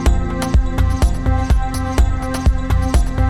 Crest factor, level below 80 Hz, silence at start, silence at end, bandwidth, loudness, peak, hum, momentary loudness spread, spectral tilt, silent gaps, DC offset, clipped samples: 12 dB; -16 dBFS; 0 s; 0 s; 13.5 kHz; -18 LUFS; -2 dBFS; none; 2 LU; -6.5 dB/octave; none; under 0.1%; under 0.1%